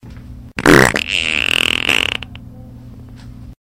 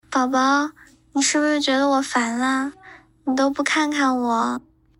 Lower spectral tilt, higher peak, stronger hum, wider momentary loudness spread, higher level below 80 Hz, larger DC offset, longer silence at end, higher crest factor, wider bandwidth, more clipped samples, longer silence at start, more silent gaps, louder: first, -3.5 dB/octave vs -1.5 dB/octave; first, 0 dBFS vs -8 dBFS; neither; first, 15 LU vs 9 LU; first, -36 dBFS vs -62 dBFS; neither; second, 0.15 s vs 0.4 s; about the same, 18 dB vs 14 dB; first, 17.5 kHz vs 12 kHz; first, 0.2% vs under 0.1%; about the same, 0.05 s vs 0.1 s; neither; first, -13 LUFS vs -20 LUFS